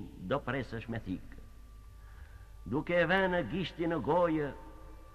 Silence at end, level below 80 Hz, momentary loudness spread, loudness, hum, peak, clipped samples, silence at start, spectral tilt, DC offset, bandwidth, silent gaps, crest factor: 0 s; -50 dBFS; 25 LU; -33 LUFS; none; -14 dBFS; under 0.1%; 0 s; -7.5 dB/octave; under 0.1%; 13.5 kHz; none; 20 dB